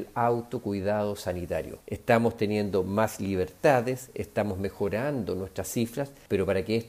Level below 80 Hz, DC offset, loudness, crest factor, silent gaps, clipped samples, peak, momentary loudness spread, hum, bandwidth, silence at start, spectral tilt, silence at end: -58 dBFS; under 0.1%; -29 LUFS; 20 dB; none; under 0.1%; -8 dBFS; 9 LU; none; 16 kHz; 0 s; -6 dB/octave; 0 s